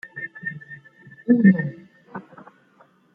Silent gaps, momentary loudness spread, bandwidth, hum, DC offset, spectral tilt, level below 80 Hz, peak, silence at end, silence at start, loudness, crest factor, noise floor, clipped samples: none; 24 LU; 2.9 kHz; none; under 0.1%; -11.5 dB/octave; -70 dBFS; -4 dBFS; 0.95 s; 0.05 s; -20 LUFS; 20 dB; -57 dBFS; under 0.1%